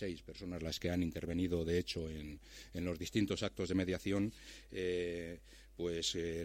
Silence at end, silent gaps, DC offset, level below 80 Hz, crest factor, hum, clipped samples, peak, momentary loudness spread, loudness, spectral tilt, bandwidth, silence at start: 0 s; none; under 0.1%; -56 dBFS; 18 dB; none; under 0.1%; -22 dBFS; 12 LU; -39 LUFS; -5 dB/octave; 16.5 kHz; 0 s